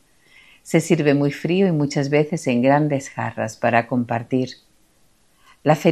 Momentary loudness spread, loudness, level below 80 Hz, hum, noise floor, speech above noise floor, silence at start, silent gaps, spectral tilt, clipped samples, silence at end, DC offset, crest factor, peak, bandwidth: 7 LU; -20 LUFS; -64 dBFS; none; -60 dBFS; 41 dB; 0.65 s; none; -6.5 dB/octave; under 0.1%; 0 s; under 0.1%; 20 dB; 0 dBFS; 14 kHz